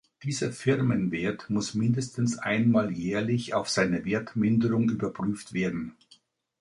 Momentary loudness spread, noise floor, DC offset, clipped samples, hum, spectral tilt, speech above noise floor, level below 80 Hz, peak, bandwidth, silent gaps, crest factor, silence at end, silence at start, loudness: 7 LU; -62 dBFS; under 0.1%; under 0.1%; none; -6 dB/octave; 35 dB; -60 dBFS; -8 dBFS; 11.5 kHz; none; 18 dB; 0.7 s; 0.2 s; -27 LUFS